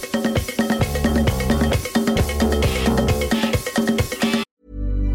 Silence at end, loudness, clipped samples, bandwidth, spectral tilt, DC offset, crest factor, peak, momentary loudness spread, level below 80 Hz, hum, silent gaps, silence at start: 0 s; -20 LUFS; under 0.1%; 17 kHz; -5.5 dB/octave; under 0.1%; 12 dB; -6 dBFS; 4 LU; -26 dBFS; none; 4.51-4.57 s; 0 s